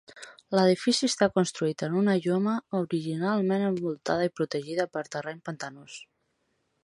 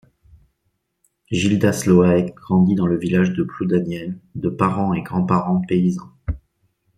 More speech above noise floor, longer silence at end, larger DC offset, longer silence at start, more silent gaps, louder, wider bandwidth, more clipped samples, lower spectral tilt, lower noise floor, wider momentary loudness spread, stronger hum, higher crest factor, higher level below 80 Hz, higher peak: second, 48 dB vs 53 dB; first, 0.85 s vs 0.6 s; neither; second, 0.15 s vs 1.3 s; neither; second, -27 LUFS vs -19 LUFS; second, 11.5 kHz vs 13 kHz; neither; second, -5 dB/octave vs -7 dB/octave; first, -75 dBFS vs -71 dBFS; about the same, 15 LU vs 14 LU; neither; about the same, 20 dB vs 18 dB; second, -70 dBFS vs -44 dBFS; second, -8 dBFS vs -2 dBFS